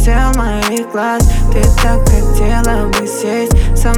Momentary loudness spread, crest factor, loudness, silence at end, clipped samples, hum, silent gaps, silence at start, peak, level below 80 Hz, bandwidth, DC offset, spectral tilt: 4 LU; 10 dB; -13 LUFS; 0 s; under 0.1%; none; none; 0 s; 0 dBFS; -12 dBFS; 16 kHz; under 0.1%; -5.5 dB/octave